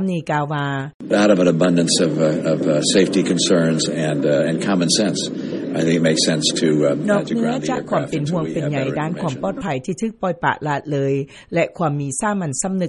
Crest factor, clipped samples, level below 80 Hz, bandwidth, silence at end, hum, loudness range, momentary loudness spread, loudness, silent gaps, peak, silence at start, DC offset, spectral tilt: 16 dB; under 0.1%; -54 dBFS; 11.5 kHz; 0 s; none; 6 LU; 8 LU; -19 LUFS; 0.94-1.00 s; -4 dBFS; 0 s; under 0.1%; -4.5 dB/octave